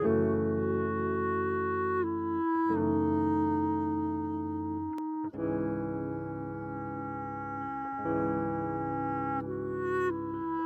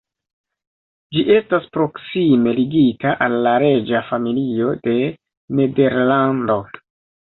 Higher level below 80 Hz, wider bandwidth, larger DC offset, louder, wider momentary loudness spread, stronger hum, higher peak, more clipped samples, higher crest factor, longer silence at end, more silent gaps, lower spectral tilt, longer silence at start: about the same, -60 dBFS vs -56 dBFS; about the same, 3.9 kHz vs 4.2 kHz; neither; second, -32 LUFS vs -17 LUFS; about the same, 9 LU vs 7 LU; neither; second, -16 dBFS vs -2 dBFS; neither; about the same, 16 dB vs 16 dB; second, 0 s vs 0.5 s; second, none vs 5.37-5.48 s; about the same, -10 dB/octave vs -10.5 dB/octave; second, 0 s vs 1.1 s